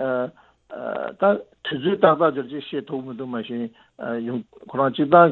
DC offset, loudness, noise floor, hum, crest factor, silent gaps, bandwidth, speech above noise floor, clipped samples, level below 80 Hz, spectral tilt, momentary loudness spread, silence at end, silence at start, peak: under 0.1%; -23 LUFS; -42 dBFS; none; 22 dB; none; 4.3 kHz; 21 dB; under 0.1%; -66 dBFS; -9.5 dB/octave; 15 LU; 0 s; 0 s; 0 dBFS